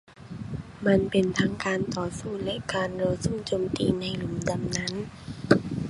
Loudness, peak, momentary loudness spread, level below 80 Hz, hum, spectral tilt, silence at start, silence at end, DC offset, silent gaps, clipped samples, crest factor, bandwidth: -28 LUFS; -2 dBFS; 13 LU; -48 dBFS; none; -5.5 dB/octave; 0.1 s; 0 s; under 0.1%; none; under 0.1%; 26 dB; 11.5 kHz